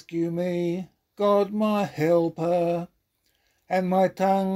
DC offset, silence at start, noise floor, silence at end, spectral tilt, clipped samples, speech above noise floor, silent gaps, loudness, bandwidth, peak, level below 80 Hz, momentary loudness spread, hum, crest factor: under 0.1%; 0.1 s; -71 dBFS; 0 s; -7.5 dB/octave; under 0.1%; 47 dB; none; -25 LUFS; 16 kHz; -10 dBFS; -68 dBFS; 8 LU; none; 16 dB